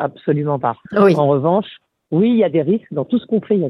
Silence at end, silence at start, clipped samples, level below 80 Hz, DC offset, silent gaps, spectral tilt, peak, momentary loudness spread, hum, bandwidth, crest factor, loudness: 0 s; 0 s; under 0.1%; -62 dBFS; under 0.1%; none; -9 dB/octave; -2 dBFS; 7 LU; none; 11 kHz; 14 dB; -17 LUFS